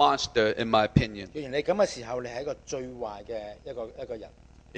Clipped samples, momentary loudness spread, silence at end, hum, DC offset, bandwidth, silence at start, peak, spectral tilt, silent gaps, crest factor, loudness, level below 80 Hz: under 0.1%; 16 LU; 0 s; none; under 0.1%; 9.6 kHz; 0 s; -4 dBFS; -5 dB/octave; none; 24 dB; -29 LUFS; -48 dBFS